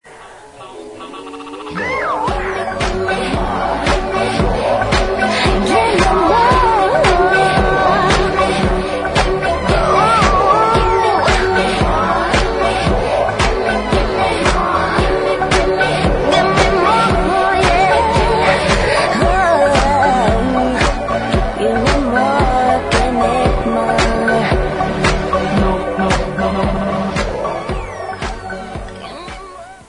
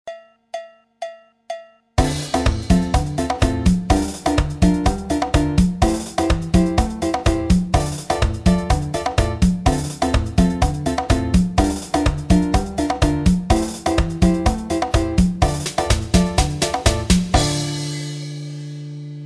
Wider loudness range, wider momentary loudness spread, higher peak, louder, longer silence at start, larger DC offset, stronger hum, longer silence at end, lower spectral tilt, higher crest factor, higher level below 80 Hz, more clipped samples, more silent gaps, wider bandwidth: first, 6 LU vs 2 LU; about the same, 12 LU vs 13 LU; about the same, 0 dBFS vs -2 dBFS; first, -14 LUFS vs -19 LUFS; about the same, 0.05 s vs 0.05 s; neither; neither; about the same, 0.1 s vs 0 s; about the same, -5 dB/octave vs -5.5 dB/octave; about the same, 14 dB vs 16 dB; about the same, -24 dBFS vs -24 dBFS; neither; neither; second, 11 kHz vs 13.5 kHz